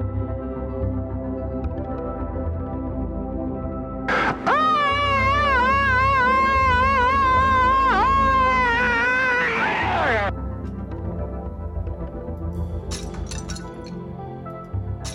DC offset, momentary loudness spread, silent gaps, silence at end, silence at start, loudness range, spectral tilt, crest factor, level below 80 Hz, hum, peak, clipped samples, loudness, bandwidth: under 0.1%; 14 LU; none; 0 s; 0 s; 13 LU; -5.5 dB/octave; 12 dB; -32 dBFS; none; -8 dBFS; under 0.1%; -21 LUFS; 11.5 kHz